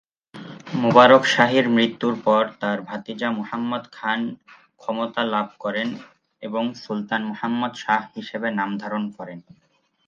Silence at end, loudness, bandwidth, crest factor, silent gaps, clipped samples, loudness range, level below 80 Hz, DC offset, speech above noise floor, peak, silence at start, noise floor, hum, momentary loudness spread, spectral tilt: 0.65 s; -21 LUFS; 9 kHz; 22 dB; none; under 0.1%; 9 LU; -70 dBFS; under 0.1%; 19 dB; 0 dBFS; 0.35 s; -41 dBFS; none; 17 LU; -5.5 dB/octave